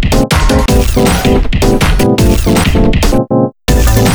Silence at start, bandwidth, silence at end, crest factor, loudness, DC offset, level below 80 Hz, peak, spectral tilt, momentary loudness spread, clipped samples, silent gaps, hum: 0 s; over 20 kHz; 0 s; 8 dB; -10 LUFS; under 0.1%; -12 dBFS; 0 dBFS; -5.5 dB/octave; 2 LU; under 0.1%; none; none